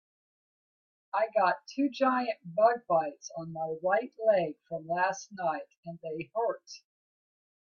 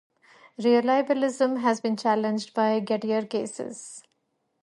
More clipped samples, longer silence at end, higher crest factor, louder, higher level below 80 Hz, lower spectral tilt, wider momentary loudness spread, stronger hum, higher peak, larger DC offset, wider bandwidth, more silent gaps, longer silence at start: neither; first, 0.9 s vs 0.65 s; about the same, 20 dB vs 16 dB; second, -30 LUFS vs -25 LUFS; about the same, -80 dBFS vs -78 dBFS; about the same, -5 dB/octave vs -5 dB/octave; about the same, 14 LU vs 15 LU; neither; about the same, -12 dBFS vs -10 dBFS; neither; second, 7 kHz vs 11.5 kHz; first, 5.77-5.83 s vs none; first, 1.15 s vs 0.6 s